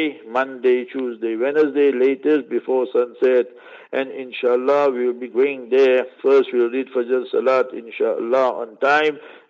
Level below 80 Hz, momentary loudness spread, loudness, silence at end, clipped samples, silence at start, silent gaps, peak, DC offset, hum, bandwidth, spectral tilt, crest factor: -80 dBFS; 8 LU; -19 LUFS; 0.15 s; under 0.1%; 0 s; none; -4 dBFS; under 0.1%; none; 7 kHz; -5.5 dB/octave; 14 dB